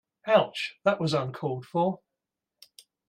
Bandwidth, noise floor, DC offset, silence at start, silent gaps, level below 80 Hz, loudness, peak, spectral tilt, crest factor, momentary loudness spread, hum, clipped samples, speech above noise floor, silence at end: 15 kHz; -87 dBFS; under 0.1%; 0.25 s; none; -70 dBFS; -27 LUFS; -8 dBFS; -6 dB/octave; 20 dB; 9 LU; none; under 0.1%; 60 dB; 1.1 s